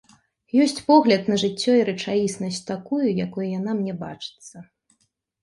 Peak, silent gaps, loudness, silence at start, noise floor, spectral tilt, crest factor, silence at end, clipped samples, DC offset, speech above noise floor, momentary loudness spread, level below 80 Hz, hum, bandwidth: -4 dBFS; none; -22 LUFS; 0.55 s; -70 dBFS; -5.5 dB/octave; 20 dB; 0.8 s; under 0.1%; under 0.1%; 48 dB; 17 LU; -64 dBFS; none; 11.5 kHz